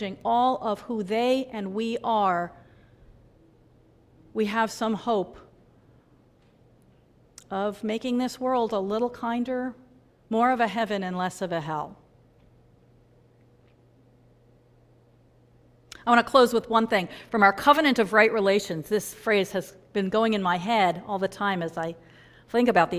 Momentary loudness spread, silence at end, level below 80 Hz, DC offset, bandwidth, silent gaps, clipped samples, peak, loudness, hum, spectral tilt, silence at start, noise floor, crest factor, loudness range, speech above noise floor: 12 LU; 0 s; -62 dBFS; under 0.1%; 16 kHz; none; under 0.1%; -4 dBFS; -25 LUFS; none; -5 dB/octave; 0 s; -59 dBFS; 22 dB; 11 LU; 34 dB